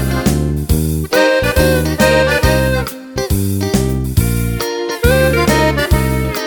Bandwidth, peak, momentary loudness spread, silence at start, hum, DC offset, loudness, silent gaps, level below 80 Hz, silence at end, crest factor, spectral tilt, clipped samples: over 20 kHz; 0 dBFS; 7 LU; 0 s; none; under 0.1%; -14 LUFS; none; -22 dBFS; 0 s; 14 dB; -5.5 dB/octave; under 0.1%